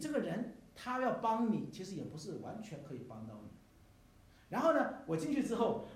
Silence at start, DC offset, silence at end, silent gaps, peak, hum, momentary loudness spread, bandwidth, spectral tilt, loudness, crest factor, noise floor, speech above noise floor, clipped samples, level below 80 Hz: 0 s; under 0.1%; 0 s; none; -18 dBFS; none; 15 LU; 15 kHz; -6 dB/octave; -38 LUFS; 20 dB; -63 dBFS; 26 dB; under 0.1%; -70 dBFS